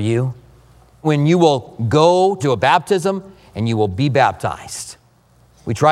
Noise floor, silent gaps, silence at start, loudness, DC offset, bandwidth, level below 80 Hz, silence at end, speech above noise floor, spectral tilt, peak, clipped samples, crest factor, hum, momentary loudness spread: -53 dBFS; none; 0 s; -17 LUFS; under 0.1%; 14 kHz; -50 dBFS; 0 s; 37 dB; -6 dB/octave; 0 dBFS; under 0.1%; 16 dB; none; 15 LU